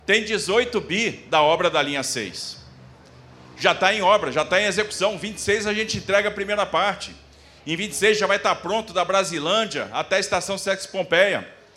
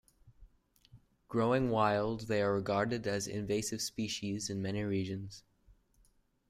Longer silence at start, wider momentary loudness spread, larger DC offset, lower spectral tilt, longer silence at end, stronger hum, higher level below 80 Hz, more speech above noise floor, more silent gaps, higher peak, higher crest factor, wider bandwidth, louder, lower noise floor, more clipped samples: second, 0.1 s vs 0.25 s; about the same, 9 LU vs 8 LU; neither; second, -2.5 dB/octave vs -5 dB/octave; second, 0.2 s vs 1.1 s; neither; first, -54 dBFS vs -62 dBFS; second, 25 dB vs 36 dB; neither; first, -2 dBFS vs -16 dBFS; about the same, 20 dB vs 20 dB; about the same, 15 kHz vs 16 kHz; first, -21 LUFS vs -34 LUFS; second, -47 dBFS vs -70 dBFS; neither